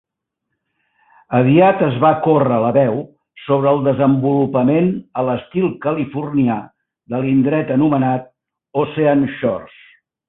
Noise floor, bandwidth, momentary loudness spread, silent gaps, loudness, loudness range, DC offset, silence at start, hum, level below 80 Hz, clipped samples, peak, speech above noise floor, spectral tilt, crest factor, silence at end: -77 dBFS; 4 kHz; 9 LU; none; -16 LUFS; 4 LU; under 0.1%; 1.3 s; none; -56 dBFS; under 0.1%; -2 dBFS; 62 dB; -13 dB/octave; 16 dB; 0.6 s